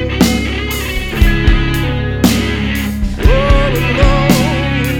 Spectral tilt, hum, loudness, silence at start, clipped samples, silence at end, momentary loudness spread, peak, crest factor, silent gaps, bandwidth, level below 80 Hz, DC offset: -5.5 dB/octave; none; -13 LUFS; 0 s; under 0.1%; 0 s; 6 LU; 0 dBFS; 12 dB; none; 19 kHz; -16 dBFS; under 0.1%